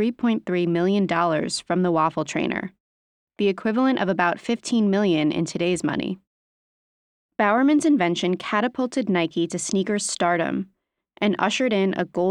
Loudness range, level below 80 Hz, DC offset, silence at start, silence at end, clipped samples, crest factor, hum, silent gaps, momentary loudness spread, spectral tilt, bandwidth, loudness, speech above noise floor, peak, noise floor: 2 LU; -64 dBFS; under 0.1%; 0 s; 0 s; under 0.1%; 18 dB; none; 2.80-3.27 s, 6.27-7.29 s; 6 LU; -5 dB/octave; 11.5 kHz; -22 LUFS; over 68 dB; -6 dBFS; under -90 dBFS